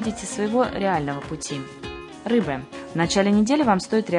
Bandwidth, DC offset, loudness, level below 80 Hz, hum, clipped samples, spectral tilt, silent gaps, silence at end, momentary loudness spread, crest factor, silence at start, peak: 11 kHz; under 0.1%; -23 LUFS; -50 dBFS; none; under 0.1%; -5 dB/octave; none; 0 s; 14 LU; 18 dB; 0 s; -6 dBFS